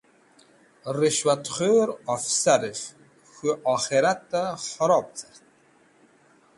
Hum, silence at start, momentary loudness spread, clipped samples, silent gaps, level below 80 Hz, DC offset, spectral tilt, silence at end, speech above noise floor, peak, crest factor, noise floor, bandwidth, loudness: none; 0.85 s; 13 LU; under 0.1%; none; -68 dBFS; under 0.1%; -3 dB/octave; 1.35 s; 36 dB; -6 dBFS; 20 dB; -59 dBFS; 11.5 kHz; -24 LUFS